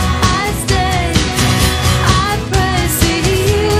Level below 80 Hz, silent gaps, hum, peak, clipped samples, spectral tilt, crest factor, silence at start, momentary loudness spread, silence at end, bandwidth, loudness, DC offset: -22 dBFS; none; none; 0 dBFS; under 0.1%; -4 dB/octave; 14 dB; 0 s; 3 LU; 0 s; 16 kHz; -13 LUFS; under 0.1%